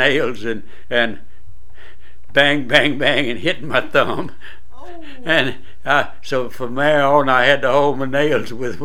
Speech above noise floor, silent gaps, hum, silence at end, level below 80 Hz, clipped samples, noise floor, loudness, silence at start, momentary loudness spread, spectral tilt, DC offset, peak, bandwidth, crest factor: 28 dB; none; none; 0 s; -48 dBFS; under 0.1%; -45 dBFS; -17 LUFS; 0 s; 13 LU; -5 dB/octave; 8%; 0 dBFS; 15.5 kHz; 20 dB